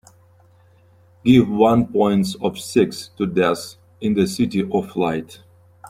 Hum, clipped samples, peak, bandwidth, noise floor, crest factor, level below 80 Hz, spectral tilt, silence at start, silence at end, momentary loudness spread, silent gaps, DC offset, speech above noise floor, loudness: none; under 0.1%; -2 dBFS; 15.5 kHz; -53 dBFS; 18 dB; -52 dBFS; -6.5 dB/octave; 1.25 s; 0 s; 11 LU; none; under 0.1%; 34 dB; -19 LUFS